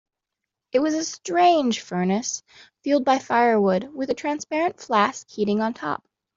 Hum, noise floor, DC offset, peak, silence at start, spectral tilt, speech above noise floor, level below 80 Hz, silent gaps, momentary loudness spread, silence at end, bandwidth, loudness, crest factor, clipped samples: none; -84 dBFS; under 0.1%; -6 dBFS; 0.75 s; -4.5 dB/octave; 62 dB; -66 dBFS; none; 11 LU; 0.4 s; 7.8 kHz; -23 LUFS; 18 dB; under 0.1%